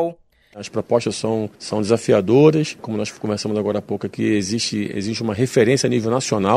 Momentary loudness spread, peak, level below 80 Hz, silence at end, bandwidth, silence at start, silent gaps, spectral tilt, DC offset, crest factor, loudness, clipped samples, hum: 10 LU; -2 dBFS; -56 dBFS; 0 s; 14 kHz; 0 s; none; -5.5 dB/octave; under 0.1%; 18 dB; -20 LUFS; under 0.1%; none